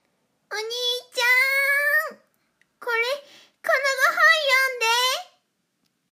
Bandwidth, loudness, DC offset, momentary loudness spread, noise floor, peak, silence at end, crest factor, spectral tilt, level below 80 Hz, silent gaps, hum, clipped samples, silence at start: 15.5 kHz; -20 LUFS; under 0.1%; 15 LU; -72 dBFS; -6 dBFS; 0.9 s; 18 dB; 3 dB/octave; under -90 dBFS; none; none; under 0.1%; 0.5 s